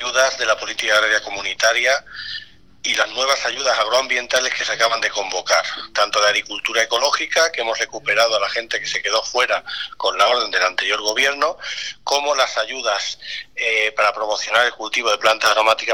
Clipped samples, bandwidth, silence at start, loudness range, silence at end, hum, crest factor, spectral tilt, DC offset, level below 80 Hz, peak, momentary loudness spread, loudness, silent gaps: under 0.1%; 17 kHz; 0 s; 1 LU; 0 s; none; 18 dB; 0.5 dB/octave; 0.4%; -58 dBFS; -2 dBFS; 7 LU; -18 LUFS; none